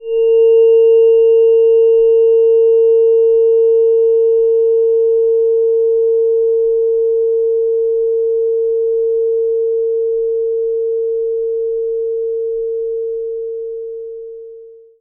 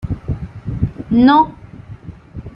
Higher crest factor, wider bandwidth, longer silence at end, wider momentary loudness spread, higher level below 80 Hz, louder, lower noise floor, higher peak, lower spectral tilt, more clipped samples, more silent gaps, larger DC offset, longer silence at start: second, 8 dB vs 16 dB; second, 3 kHz vs 5.6 kHz; first, 0.3 s vs 0.05 s; second, 11 LU vs 24 LU; second, -54 dBFS vs -34 dBFS; first, -13 LUFS vs -16 LUFS; about the same, -37 dBFS vs -35 dBFS; about the same, -4 dBFS vs -2 dBFS; about the same, -8 dB/octave vs -9 dB/octave; neither; neither; neither; about the same, 0 s vs 0.05 s